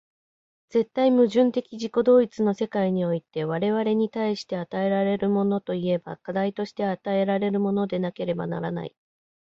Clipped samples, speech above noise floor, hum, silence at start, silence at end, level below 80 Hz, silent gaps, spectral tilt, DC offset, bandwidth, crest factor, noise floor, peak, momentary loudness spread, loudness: under 0.1%; over 66 dB; none; 0.75 s; 0.65 s; -66 dBFS; none; -7.5 dB/octave; under 0.1%; 7.6 kHz; 16 dB; under -90 dBFS; -8 dBFS; 10 LU; -25 LUFS